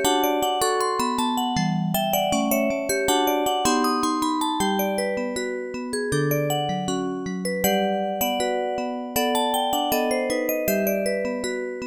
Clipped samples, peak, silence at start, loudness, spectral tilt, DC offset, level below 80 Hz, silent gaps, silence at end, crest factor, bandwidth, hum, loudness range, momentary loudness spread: under 0.1%; -8 dBFS; 0 s; -23 LUFS; -4 dB/octave; under 0.1%; -54 dBFS; none; 0 s; 14 dB; over 20 kHz; none; 3 LU; 6 LU